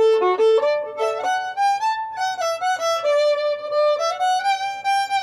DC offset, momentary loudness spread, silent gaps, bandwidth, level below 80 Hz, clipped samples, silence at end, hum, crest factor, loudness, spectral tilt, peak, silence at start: under 0.1%; 6 LU; none; 13.5 kHz; -70 dBFS; under 0.1%; 0 s; none; 10 dB; -20 LUFS; -1 dB/octave; -10 dBFS; 0 s